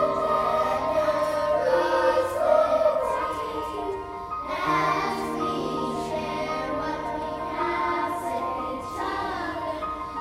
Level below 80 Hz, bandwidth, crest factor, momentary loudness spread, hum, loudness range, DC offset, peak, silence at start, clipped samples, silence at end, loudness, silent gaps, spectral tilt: -50 dBFS; 15.5 kHz; 18 dB; 9 LU; none; 5 LU; under 0.1%; -8 dBFS; 0 s; under 0.1%; 0 s; -26 LUFS; none; -5 dB/octave